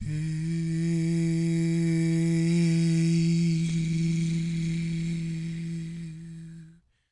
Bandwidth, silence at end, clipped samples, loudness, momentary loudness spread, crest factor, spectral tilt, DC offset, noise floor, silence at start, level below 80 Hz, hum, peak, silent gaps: 11 kHz; 0.4 s; under 0.1%; -27 LUFS; 13 LU; 12 dB; -7 dB/octave; under 0.1%; -53 dBFS; 0 s; -52 dBFS; none; -16 dBFS; none